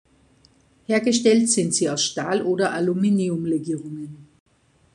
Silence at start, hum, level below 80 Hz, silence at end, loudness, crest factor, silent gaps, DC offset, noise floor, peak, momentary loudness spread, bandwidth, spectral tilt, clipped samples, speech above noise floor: 0.9 s; none; -66 dBFS; 0.7 s; -21 LUFS; 18 dB; none; under 0.1%; -57 dBFS; -4 dBFS; 15 LU; 11 kHz; -4 dB/octave; under 0.1%; 36 dB